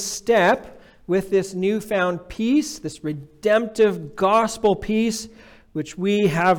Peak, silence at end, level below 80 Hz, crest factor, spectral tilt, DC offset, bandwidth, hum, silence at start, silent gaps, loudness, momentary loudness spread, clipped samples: -8 dBFS; 0 s; -50 dBFS; 12 dB; -5 dB/octave; under 0.1%; 18.5 kHz; none; 0 s; none; -21 LUFS; 13 LU; under 0.1%